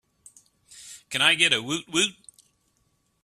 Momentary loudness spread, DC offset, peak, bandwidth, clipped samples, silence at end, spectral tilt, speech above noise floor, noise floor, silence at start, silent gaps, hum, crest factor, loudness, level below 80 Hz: 20 LU; under 0.1%; -4 dBFS; 15 kHz; under 0.1%; 1.1 s; -1.5 dB/octave; 47 dB; -70 dBFS; 0.75 s; none; none; 24 dB; -22 LUFS; -68 dBFS